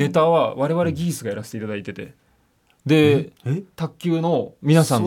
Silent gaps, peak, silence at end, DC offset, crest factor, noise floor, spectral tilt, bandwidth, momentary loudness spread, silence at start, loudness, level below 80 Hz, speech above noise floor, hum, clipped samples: none; -4 dBFS; 0 s; under 0.1%; 16 dB; -62 dBFS; -6.5 dB/octave; 16.5 kHz; 14 LU; 0 s; -21 LUFS; -62 dBFS; 42 dB; none; under 0.1%